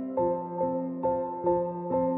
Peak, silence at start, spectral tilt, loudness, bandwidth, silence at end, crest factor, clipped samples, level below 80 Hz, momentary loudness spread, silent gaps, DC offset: -16 dBFS; 0 s; -13.5 dB/octave; -29 LUFS; 2.8 kHz; 0 s; 14 dB; under 0.1%; -58 dBFS; 2 LU; none; under 0.1%